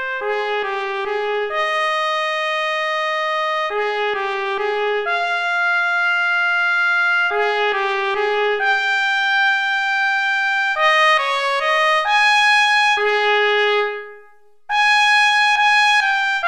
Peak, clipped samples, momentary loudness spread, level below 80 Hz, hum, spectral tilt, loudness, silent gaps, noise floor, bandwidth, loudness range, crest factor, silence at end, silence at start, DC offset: -4 dBFS; under 0.1%; 8 LU; -60 dBFS; none; 1 dB/octave; -16 LUFS; none; -51 dBFS; 13 kHz; 5 LU; 14 dB; 0 s; 0 s; 0.2%